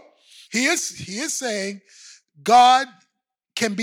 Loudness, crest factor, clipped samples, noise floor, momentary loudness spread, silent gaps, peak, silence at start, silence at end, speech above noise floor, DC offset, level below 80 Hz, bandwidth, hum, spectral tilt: -20 LUFS; 16 dB; under 0.1%; -79 dBFS; 18 LU; none; -6 dBFS; 0.5 s; 0 s; 60 dB; under 0.1%; -66 dBFS; 19.5 kHz; none; -2 dB/octave